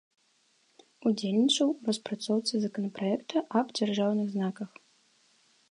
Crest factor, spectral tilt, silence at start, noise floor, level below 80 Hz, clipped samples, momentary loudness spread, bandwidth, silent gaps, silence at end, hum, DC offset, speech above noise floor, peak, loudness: 18 dB; -5 dB/octave; 1 s; -69 dBFS; -82 dBFS; under 0.1%; 8 LU; 11 kHz; none; 1.05 s; none; under 0.1%; 40 dB; -12 dBFS; -29 LUFS